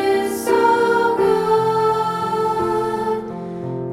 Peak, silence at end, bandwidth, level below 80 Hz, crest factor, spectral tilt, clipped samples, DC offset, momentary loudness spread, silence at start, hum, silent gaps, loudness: -4 dBFS; 0 s; 16.5 kHz; -52 dBFS; 14 dB; -5.5 dB/octave; under 0.1%; under 0.1%; 10 LU; 0 s; none; none; -18 LUFS